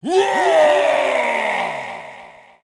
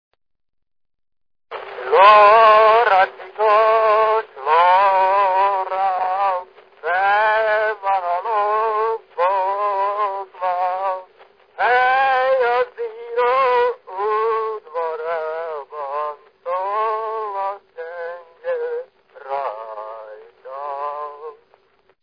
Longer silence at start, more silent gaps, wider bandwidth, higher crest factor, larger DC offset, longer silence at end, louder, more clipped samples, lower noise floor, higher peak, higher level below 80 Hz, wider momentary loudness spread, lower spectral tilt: second, 0.05 s vs 1.5 s; neither; first, 12 kHz vs 5.2 kHz; about the same, 14 dB vs 18 dB; neither; second, 0.3 s vs 0.7 s; about the same, -16 LUFS vs -18 LUFS; neither; second, -42 dBFS vs -57 dBFS; second, -4 dBFS vs 0 dBFS; about the same, -64 dBFS vs -64 dBFS; about the same, 17 LU vs 18 LU; about the same, -3 dB/octave vs -3.5 dB/octave